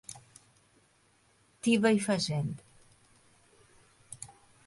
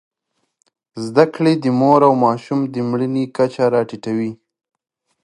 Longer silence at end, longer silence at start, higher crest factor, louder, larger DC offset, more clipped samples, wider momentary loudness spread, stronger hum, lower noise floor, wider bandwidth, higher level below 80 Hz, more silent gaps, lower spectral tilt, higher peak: second, 0.4 s vs 0.9 s; second, 0.1 s vs 0.95 s; about the same, 20 dB vs 18 dB; second, -29 LUFS vs -17 LUFS; neither; neither; first, 23 LU vs 11 LU; neither; second, -67 dBFS vs -72 dBFS; about the same, 11.5 kHz vs 11 kHz; about the same, -68 dBFS vs -66 dBFS; neither; second, -5 dB/octave vs -7.5 dB/octave; second, -14 dBFS vs 0 dBFS